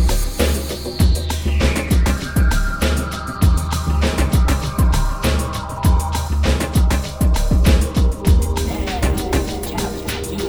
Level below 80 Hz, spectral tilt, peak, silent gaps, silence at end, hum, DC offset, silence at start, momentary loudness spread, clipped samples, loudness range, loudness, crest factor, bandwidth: -18 dBFS; -5.5 dB/octave; -2 dBFS; none; 0 s; none; 0.2%; 0 s; 6 LU; under 0.1%; 1 LU; -19 LUFS; 14 dB; over 20 kHz